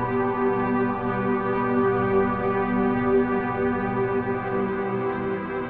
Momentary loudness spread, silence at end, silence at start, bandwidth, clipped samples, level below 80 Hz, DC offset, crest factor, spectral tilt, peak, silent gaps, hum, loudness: 5 LU; 0 s; 0 s; 4.5 kHz; under 0.1%; -46 dBFS; under 0.1%; 14 dB; -7 dB/octave; -10 dBFS; none; none; -24 LUFS